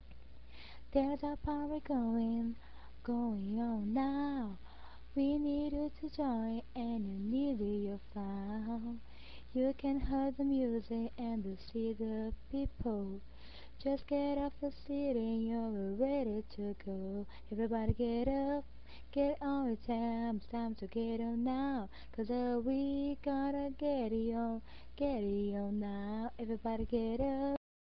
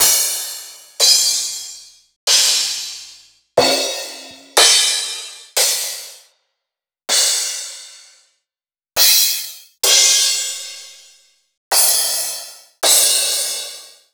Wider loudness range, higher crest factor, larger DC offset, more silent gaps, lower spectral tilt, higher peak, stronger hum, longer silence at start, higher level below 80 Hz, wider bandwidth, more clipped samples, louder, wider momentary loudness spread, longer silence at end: about the same, 2 LU vs 4 LU; about the same, 18 dB vs 18 dB; first, 0.4% vs under 0.1%; second, none vs 2.16-2.27 s, 11.57-11.71 s; first, -7 dB/octave vs 2 dB/octave; second, -18 dBFS vs 0 dBFS; neither; about the same, 0 s vs 0 s; first, -52 dBFS vs -62 dBFS; second, 5.6 kHz vs over 20 kHz; neither; second, -38 LUFS vs -14 LUFS; second, 9 LU vs 20 LU; about the same, 0.25 s vs 0.25 s